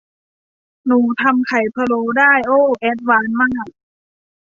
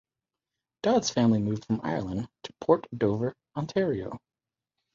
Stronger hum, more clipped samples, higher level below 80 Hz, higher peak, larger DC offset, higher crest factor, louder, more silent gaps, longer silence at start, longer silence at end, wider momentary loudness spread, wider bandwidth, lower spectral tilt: neither; neither; about the same, -56 dBFS vs -58 dBFS; first, -2 dBFS vs -8 dBFS; neither; second, 16 dB vs 22 dB; first, -15 LUFS vs -28 LUFS; neither; about the same, 0.85 s vs 0.85 s; about the same, 0.8 s vs 0.75 s; second, 7 LU vs 12 LU; about the same, 7.2 kHz vs 7.6 kHz; about the same, -6 dB/octave vs -6 dB/octave